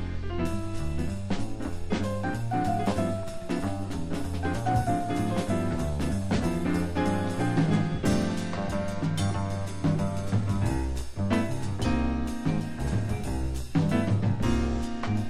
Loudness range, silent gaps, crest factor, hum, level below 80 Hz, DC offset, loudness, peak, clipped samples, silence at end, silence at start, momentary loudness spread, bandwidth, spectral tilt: 3 LU; none; 16 dB; none; -38 dBFS; 1%; -29 LUFS; -12 dBFS; under 0.1%; 0 s; 0 s; 6 LU; 14 kHz; -7 dB/octave